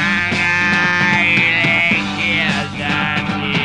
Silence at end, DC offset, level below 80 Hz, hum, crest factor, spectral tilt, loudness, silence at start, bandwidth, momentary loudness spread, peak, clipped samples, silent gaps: 0 s; 0.2%; -44 dBFS; none; 14 dB; -4.5 dB/octave; -14 LUFS; 0 s; 11 kHz; 6 LU; -2 dBFS; under 0.1%; none